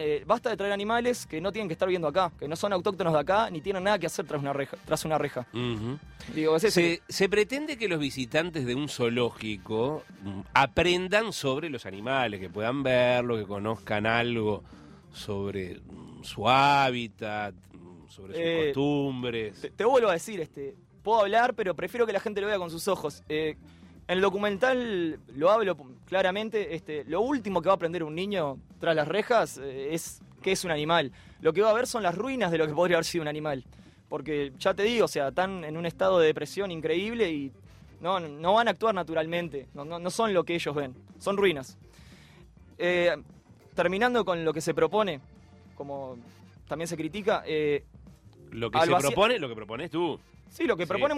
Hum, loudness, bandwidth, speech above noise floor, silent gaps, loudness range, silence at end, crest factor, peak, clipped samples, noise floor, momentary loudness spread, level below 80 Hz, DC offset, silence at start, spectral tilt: none; -28 LUFS; 16 kHz; 25 dB; none; 3 LU; 0 s; 20 dB; -8 dBFS; under 0.1%; -53 dBFS; 13 LU; -58 dBFS; under 0.1%; 0 s; -5 dB/octave